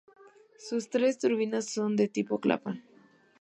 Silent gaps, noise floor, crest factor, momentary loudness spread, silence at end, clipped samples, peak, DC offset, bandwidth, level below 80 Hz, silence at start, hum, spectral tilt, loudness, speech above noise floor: none; -60 dBFS; 20 dB; 11 LU; 0.6 s; under 0.1%; -10 dBFS; under 0.1%; 11 kHz; -78 dBFS; 0.6 s; none; -5 dB/octave; -30 LUFS; 31 dB